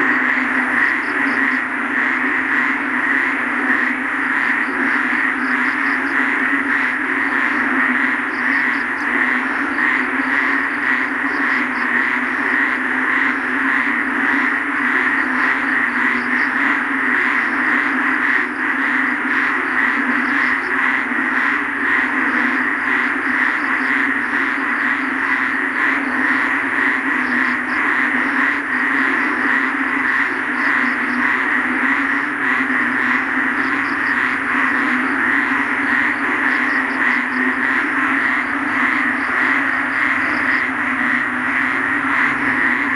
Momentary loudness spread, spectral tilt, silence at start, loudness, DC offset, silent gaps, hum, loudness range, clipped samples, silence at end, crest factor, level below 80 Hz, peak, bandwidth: 2 LU; -4 dB/octave; 0 s; -16 LUFS; under 0.1%; none; none; 1 LU; under 0.1%; 0 s; 16 dB; -54 dBFS; -2 dBFS; 11.5 kHz